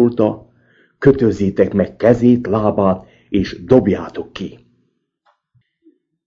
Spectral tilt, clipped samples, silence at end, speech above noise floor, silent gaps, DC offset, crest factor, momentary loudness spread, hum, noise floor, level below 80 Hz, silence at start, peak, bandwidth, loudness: -8.5 dB/octave; 0.1%; 1.75 s; 50 dB; none; under 0.1%; 16 dB; 15 LU; none; -65 dBFS; -44 dBFS; 0 s; 0 dBFS; 7.2 kHz; -16 LUFS